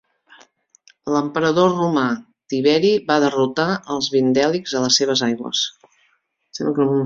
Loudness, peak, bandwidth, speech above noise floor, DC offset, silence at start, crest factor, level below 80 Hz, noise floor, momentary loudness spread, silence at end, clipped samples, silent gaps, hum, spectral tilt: -19 LUFS; -2 dBFS; 7.8 kHz; 46 dB; under 0.1%; 1.05 s; 18 dB; -62 dBFS; -64 dBFS; 9 LU; 0 s; under 0.1%; none; none; -4 dB/octave